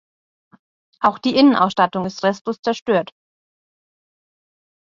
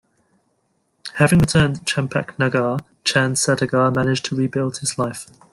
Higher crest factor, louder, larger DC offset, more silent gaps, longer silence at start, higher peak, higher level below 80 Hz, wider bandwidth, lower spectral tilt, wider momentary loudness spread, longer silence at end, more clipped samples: about the same, 20 dB vs 18 dB; about the same, -18 LUFS vs -19 LUFS; neither; first, 2.41-2.45 s, 2.59-2.63 s vs none; about the same, 1 s vs 1.05 s; about the same, -2 dBFS vs -2 dBFS; second, -62 dBFS vs -46 dBFS; second, 7.4 kHz vs 12.5 kHz; about the same, -5.5 dB/octave vs -5 dB/octave; about the same, 9 LU vs 9 LU; first, 1.85 s vs 0.3 s; neither